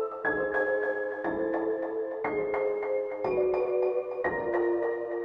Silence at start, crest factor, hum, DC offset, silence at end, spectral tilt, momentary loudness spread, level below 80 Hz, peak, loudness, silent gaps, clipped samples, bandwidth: 0 s; 14 dB; none; under 0.1%; 0 s; -8.5 dB/octave; 4 LU; -62 dBFS; -16 dBFS; -29 LUFS; none; under 0.1%; 5.2 kHz